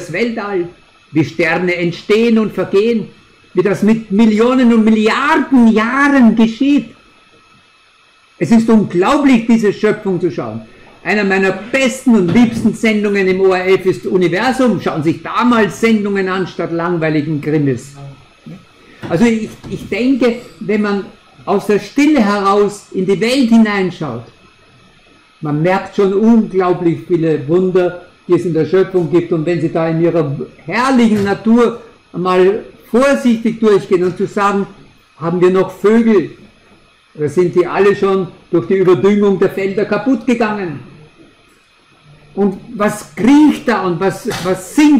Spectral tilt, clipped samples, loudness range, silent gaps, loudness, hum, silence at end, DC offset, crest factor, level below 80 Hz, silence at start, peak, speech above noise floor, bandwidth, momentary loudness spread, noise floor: -6.5 dB/octave; under 0.1%; 5 LU; none; -13 LUFS; none; 0 s; under 0.1%; 14 dB; -48 dBFS; 0 s; 0 dBFS; 37 dB; 13.5 kHz; 10 LU; -49 dBFS